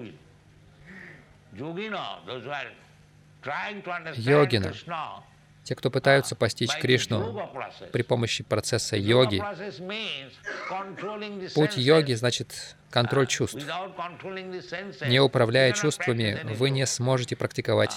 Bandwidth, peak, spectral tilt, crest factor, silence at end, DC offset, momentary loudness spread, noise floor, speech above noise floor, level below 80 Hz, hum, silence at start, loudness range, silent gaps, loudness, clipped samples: 14.5 kHz; -6 dBFS; -4.5 dB/octave; 20 dB; 0 s; under 0.1%; 16 LU; -55 dBFS; 29 dB; -64 dBFS; none; 0 s; 4 LU; none; -26 LUFS; under 0.1%